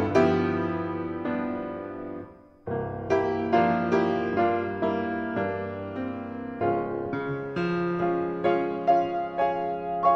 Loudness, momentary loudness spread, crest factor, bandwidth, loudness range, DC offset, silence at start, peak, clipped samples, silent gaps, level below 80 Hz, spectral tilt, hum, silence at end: -27 LUFS; 11 LU; 18 dB; 7.2 kHz; 3 LU; under 0.1%; 0 s; -8 dBFS; under 0.1%; none; -58 dBFS; -8 dB/octave; none; 0 s